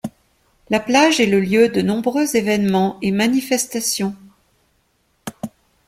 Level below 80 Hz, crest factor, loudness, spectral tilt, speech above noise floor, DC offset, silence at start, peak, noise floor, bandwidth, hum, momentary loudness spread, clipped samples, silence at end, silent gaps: -56 dBFS; 18 dB; -17 LUFS; -4 dB/octave; 47 dB; under 0.1%; 0.05 s; -2 dBFS; -64 dBFS; 16.5 kHz; none; 19 LU; under 0.1%; 0.4 s; none